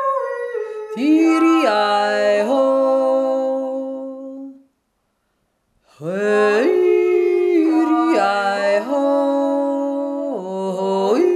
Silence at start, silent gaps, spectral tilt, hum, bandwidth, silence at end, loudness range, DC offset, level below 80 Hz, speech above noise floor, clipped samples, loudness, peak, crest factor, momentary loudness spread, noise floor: 0 s; none; -5.5 dB/octave; none; 11.5 kHz; 0 s; 6 LU; under 0.1%; -74 dBFS; 54 dB; under 0.1%; -17 LUFS; -4 dBFS; 14 dB; 12 LU; -69 dBFS